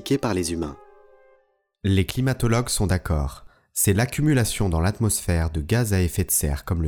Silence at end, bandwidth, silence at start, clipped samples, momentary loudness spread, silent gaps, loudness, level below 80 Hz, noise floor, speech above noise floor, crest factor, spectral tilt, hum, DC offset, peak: 0 s; 19.5 kHz; 0 s; under 0.1%; 7 LU; none; -23 LUFS; -36 dBFS; -63 dBFS; 41 dB; 16 dB; -5 dB/octave; none; under 0.1%; -6 dBFS